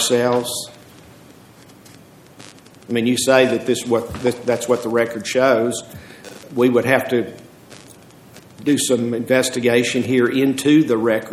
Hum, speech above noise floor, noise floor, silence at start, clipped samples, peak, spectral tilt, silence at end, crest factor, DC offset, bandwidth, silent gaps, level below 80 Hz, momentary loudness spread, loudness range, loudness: none; 27 dB; -45 dBFS; 0 s; under 0.1%; 0 dBFS; -4 dB/octave; 0 s; 20 dB; under 0.1%; 15.5 kHz; none; -56 dBFS; 12 LU; 4 LU; -18 LUFS